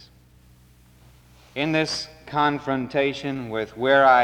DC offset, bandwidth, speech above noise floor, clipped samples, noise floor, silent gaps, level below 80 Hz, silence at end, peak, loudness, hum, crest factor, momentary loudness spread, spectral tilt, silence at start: under 0.1%; 16 kHz; 32 dB; under 0.1%; -53 dBFS; none; -56 dBFS; 0 s; -6 dBFS; -23 LUFS; none; 18 dB; 12 LU; -5 dB/octave; 1.55 s